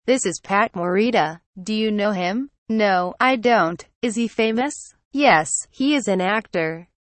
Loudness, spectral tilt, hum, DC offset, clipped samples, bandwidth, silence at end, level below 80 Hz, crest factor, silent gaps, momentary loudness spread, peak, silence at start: -20 LUFS; -4 dB/octave; none; under 0.1%; under 0.1%; 8.8 kHz; 0.35 s; -60 dBFS; 18 dB; 1.46-1.53 s, 2.58-2.66 s, 3.95-4.01 s, 5.05-5.11 s; 10 LU; -2 dBFS; 0.05 s